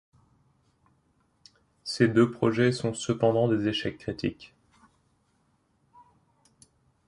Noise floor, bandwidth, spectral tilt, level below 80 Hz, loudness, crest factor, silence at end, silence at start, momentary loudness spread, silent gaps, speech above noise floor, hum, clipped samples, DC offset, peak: -70 dBFS; 11.5 kHz; -6 dB/octave; -60 dBFS; -26 LUFS; 22 dB; 2.6 s; 1.85 s; 12 LU; none; 44 dB; none; under 0.1%; under 0.1%; -8 dBFS